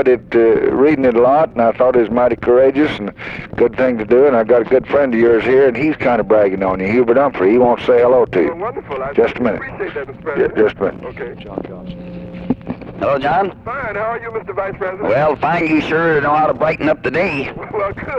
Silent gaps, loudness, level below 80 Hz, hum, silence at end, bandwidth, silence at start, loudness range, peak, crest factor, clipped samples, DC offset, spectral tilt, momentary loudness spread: none; -15 LUFS; -42 dBFS; none; 0 s; 7 kHz; 0 s; 8 LU; 0 dBFS; 14 dB; under 0.1%; under 0.1%; -8 dB/octave; 13 LU